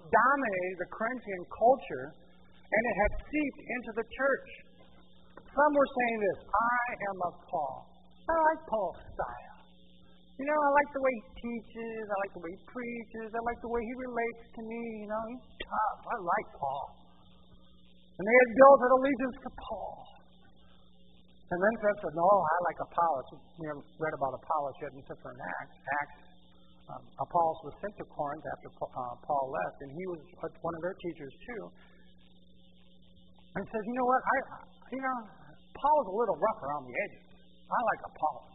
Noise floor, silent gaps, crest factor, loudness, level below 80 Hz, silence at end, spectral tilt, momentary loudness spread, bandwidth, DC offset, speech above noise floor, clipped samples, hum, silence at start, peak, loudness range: -61 dBFS; none; 26 dB; -31 LUFS; -56 dBFS; 0.15 s; 0.5 dB/octave; 17 LU; 3.9 kHz; 0.1%; 30 dB; under 0.1%; none; 0.05 s; -6 dBFS; 11 LU